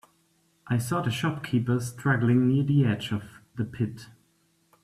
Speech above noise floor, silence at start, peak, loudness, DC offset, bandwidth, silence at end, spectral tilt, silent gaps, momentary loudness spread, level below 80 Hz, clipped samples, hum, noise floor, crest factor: 42 dB; 0.65 s; -12 dBFS; -27 LUFS; under 0.1%; 13.5 kHz; 0.75 s; -6.5 dB/octave; none; 12 LU; -60 dBFS; under 0.1%; none; -68 dBFS; 16 dB